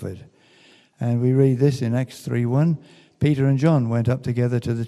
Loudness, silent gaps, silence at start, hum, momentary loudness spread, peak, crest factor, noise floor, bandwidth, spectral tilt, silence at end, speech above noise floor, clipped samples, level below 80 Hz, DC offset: -21 LUFS; none; 0 s; none; 9 LU; -6 dBFS; 16 dB; -54 dBFS; 12 kHz; -8.5 dB/octave; 0 s; 33 dB; under 0.1%; -56 dBFS; under 0.1%